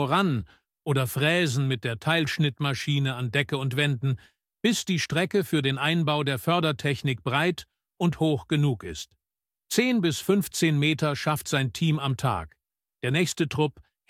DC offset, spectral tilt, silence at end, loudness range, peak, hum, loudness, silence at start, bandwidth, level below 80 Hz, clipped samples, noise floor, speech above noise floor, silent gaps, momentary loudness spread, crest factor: under 0.1%; -5 dB/octave; 0.3 s; 2 LU; -8 dBFS; none; -26 LUFS; 0 s; 16 kHz; -56 dBFS; under 0.1%; under -90 dBFS; over 65 dB; none; 6 LU; 18 dB